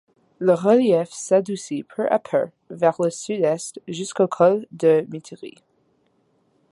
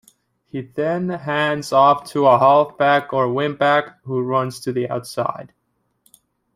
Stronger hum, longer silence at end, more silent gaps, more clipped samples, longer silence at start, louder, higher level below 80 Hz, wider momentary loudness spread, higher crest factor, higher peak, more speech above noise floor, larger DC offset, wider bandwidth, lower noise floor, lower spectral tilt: neither; first, 1.25 s vs 1.1 s; neither; neither; second, 0.4 s vs 0.55 s; second, -21 LUFS vs -18 LUFS; second, -70 dBFS vs -64 dBFS; first, 15 LU vs 11 LU; about the same, 18 dB vs 18 dB; about the same, -4 dBFS vs -2 dBFS; about the same, 44 dB vs 45 dB; neither; second, 11.5 kHz vs 15.5 kHz; about the same, -65 dBFS vs -63 dBFS; about the same, -5.5 dB/octave vs -6 dB/octave